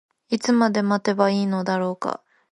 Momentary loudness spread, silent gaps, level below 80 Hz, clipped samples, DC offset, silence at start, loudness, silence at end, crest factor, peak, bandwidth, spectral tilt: 10 LU; none; -70 dBFS; under 0.1%; under 0.1%; 0.3 s; -22 LUFS; 0.35 s; 18 dB; -4 dBFS; 11 kHz; -6 dB/octave